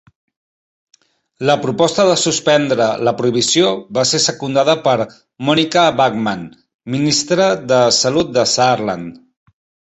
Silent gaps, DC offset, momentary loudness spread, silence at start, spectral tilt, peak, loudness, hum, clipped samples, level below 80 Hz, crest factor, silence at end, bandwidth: 6.74-6.79 s; under 0.1%; 10 LU; 1.4 s; -3.5 dB/octave; 0 dBFS; -14 LUFS; none; under 0.1%; -54 dBFS; 16 dB; 0.75 s; 8.4 kHz